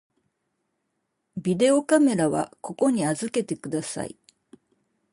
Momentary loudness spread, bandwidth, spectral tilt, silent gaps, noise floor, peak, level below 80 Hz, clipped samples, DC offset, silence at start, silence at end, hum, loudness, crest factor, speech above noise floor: 14 LU; 11.5 kHz; -5.5 dB/octave; none; -77 dBFS; -10 dBFS; -66 dBFS; under 0.1%; under 0.1%; 1.35 s; 1.05 s; none; -24 LUFS; 16 dB; 54 dB